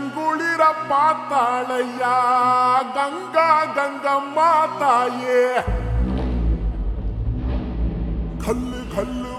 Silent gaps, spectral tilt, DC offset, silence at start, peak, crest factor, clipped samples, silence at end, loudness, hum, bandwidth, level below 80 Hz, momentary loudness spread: none; -6 dB/octave; under 0.1%; 0 s; -4 dBFS; 16 dB; under 0.1%; 0 s; -20 LUFS; none; 13 kHz; -28 dBFS; 10 LU